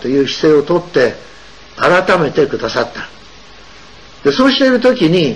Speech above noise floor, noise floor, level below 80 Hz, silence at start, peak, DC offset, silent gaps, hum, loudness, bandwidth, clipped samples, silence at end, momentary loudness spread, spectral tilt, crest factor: 27 dB; -39 dBFS; -44 dBFS; 0 s; -2 dBFS; 0.8%; none; none; -13 LUFS; 10.5 kHz; under 0.1%; 0 s; 9 LU; -5.5 dB/octave; 12 dB